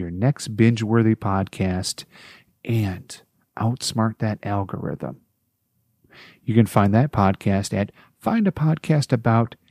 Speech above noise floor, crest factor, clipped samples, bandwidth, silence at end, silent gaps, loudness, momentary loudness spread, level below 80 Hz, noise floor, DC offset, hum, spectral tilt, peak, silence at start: 50 dB; 20 dB; under 0.1%; 15 kHz; 0.15 s; none; -22 LUFS; 15 LU; -54 dBFS; -71 dBFS; under 0.1%; none; -6.5 dB/octave; -2 dBFS; 0 s